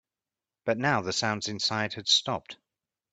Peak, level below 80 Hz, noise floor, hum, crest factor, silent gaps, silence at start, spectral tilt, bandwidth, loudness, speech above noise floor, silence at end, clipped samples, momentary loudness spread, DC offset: -10 dBFS; -68 dBFS; under -90 dBFS; none; 20 dB; none; 0.65 s; -3 dB/octave; 9.4 kHz; -27 LUFS; over 62 dB; 0.6 s; under 0.1%; 12 LU; under 0.1%